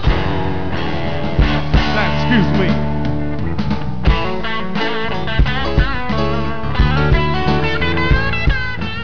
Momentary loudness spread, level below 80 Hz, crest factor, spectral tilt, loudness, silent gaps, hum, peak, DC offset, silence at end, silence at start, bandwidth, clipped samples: 6 LU; -22 dBFS; 18 dB; -7.5 dB/octave; -18 LUFS; none; none; 0 dBFS; 10%; 0 s; 0 s; 5.4 kHz; under 0.1%